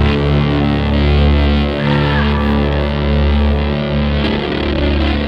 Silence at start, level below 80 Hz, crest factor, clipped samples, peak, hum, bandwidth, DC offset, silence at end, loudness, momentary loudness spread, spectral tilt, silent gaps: 0 s; -18 dBFS; 12 dB; under 0.1%; -2 dBFS; none; 5.8 kHz; under 0.1%; 0 s; -14 LUFS; 4 LU; -8.5 dB/octave; none